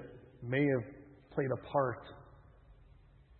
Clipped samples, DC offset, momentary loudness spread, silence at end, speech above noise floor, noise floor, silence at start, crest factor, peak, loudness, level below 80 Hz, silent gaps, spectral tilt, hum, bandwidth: under 0.1%; under 0.1%; 22 LU; 0.65 s; 27 dB; -60 dBFS; 0 s; 20 dB; -18 dBFS; -35 LUFS; -64 dBFS; none; -6.5 dB/octave; none; 4.2 kHz